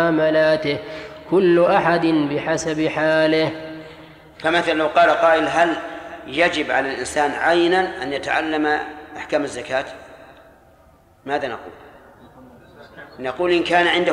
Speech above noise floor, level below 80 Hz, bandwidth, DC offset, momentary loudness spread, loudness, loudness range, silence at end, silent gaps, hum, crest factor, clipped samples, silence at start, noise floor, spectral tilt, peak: 33 dB; -54 dBFS; 11.5 kHz; under 0.1%; 18 LU; -19 LUFS; 11 LU; 0 s; none; none; 18 dB; under 0.1%; 0 s; -52 dBFS; -4.5 dB/octave; -2 dBFS